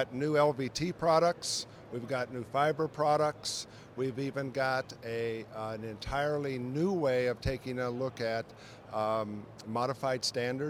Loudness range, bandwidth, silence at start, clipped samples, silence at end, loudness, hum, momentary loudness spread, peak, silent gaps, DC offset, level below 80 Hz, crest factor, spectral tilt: 4 LU; over 20 kHz; 0 s; under 0.1%; 0 s; -33 LUFS; none; 11 LU; -12 dBFS; none; under 0.1%; -56 dBFS; 20 dB; -4.5 dB/octave